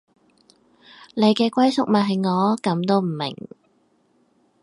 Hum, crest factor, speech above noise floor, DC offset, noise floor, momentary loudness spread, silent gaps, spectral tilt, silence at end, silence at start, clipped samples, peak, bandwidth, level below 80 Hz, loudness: none; 18 dB; 43 dB; under 0.1%; -63 dBFS; 13 LU; none; -6.5 dB/octave; 1.25 s; 1 s; under 0.1%; -4 dBFS; 11.5 kHz; -70 dBFS; -20 LUFS